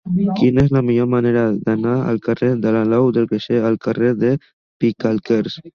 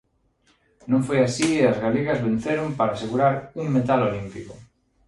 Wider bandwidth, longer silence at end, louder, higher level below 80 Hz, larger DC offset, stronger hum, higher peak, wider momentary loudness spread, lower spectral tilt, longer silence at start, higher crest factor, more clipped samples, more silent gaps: second, 6.8 kHz vs 11.5 kHz; second, 0.05 s vs 0.45 s; first, -17 LUFS vs -22 LUFS; first, -46 dBFS vs -54 dBFS; neither; neither; first, -2 dBFS vs -6 dBFS; second, 5 LU vs 13 LU; first, -9 dB/octave vs -6 dB/octave; second, 0.05 s vs 0.85 s; about the same, 14 dB vs 18 dB; neither; first, 4.53-4.80 s vs none